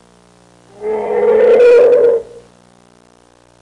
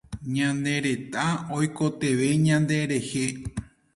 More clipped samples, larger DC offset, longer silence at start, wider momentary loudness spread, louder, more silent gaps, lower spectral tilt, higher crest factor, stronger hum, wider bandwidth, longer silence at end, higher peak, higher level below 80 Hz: neither; neither; first, 0.8 s vs 0.1 s; first, 14 LU vs 9 LU; first, -10 LUFS vs -25 LUFS; neither; about the same, -5.5 dB/octave vs -5.5 dB/octave; second, 10 dB vs 16 dB; first, 60 Hz at -50 dBFS vs none; second, 7.6 kHz vs 11.5 kHz; first, 1.4 s vs 0.3 s; first, -2 dBFS vs -10 dBFS; about the same, -54 dBFS vs -52 dBFS